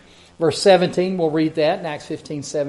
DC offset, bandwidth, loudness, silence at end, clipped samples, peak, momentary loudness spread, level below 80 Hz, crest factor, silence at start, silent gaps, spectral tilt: under 0.1%; 11.5 kHz; -19 LUFS; 0 s; under 0.1%; -2 dBFS; 14 LU; -60 dBFS; 18 dB; 0.4 s; none; -5 dB/octave